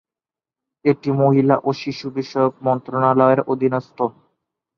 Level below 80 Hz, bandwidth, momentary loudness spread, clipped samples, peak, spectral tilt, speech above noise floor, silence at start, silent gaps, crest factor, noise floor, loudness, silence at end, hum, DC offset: -62 dBFS; 6.8 kHz; 10 LU; under 0.1%; -2 dBFS; -8.5 dB/octave; over 72 dB; 0.85 s; none; 18 dB; under -90 dBFS; -19 LUFS; 0.65 s; none; under 0.1%